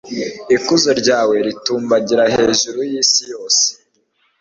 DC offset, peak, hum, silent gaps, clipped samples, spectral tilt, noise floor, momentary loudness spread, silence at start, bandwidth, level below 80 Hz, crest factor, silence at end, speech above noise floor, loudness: under 0.1%; 0 dBFS; none; none; under 0.1%; -2 dB/octave; -62 dBFS; 6 LU; 0.05 s; 8 kHz; -54 dBFS; 16 dB; 0.7 s; 47 dB; -15 LUFS